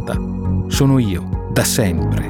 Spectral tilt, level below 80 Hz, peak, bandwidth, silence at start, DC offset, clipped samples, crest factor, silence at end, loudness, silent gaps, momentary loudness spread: -5.5 dB/octave; -28 dBFS; -2 dBFS; 17.5 kHz; 0 s; under 0.1%; under 0.1%; 16 dB; 0 s; -17 LUFS; none; 7 LU